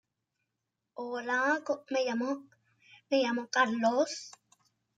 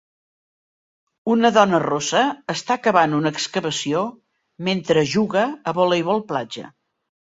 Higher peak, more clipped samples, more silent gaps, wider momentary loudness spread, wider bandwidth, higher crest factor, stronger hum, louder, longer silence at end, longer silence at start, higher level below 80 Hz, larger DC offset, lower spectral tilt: second, -14 dBFS vs -2 dBFS; neither; neither; about the same, 13 LU vs 11 LU; first, 9.2 kHz vs 7.8 kHz; about the same, 20 dB vs 20 dB; neither; second, -31 LUFS vs -20 LUFS; about the same, 0.65 s vs 0.6 s; second, 0.95 s vs 1.25 s; second, -86 dBFS vs -64 dBFS; neither; second, -3 dB/octave vs -4.5 dB/octave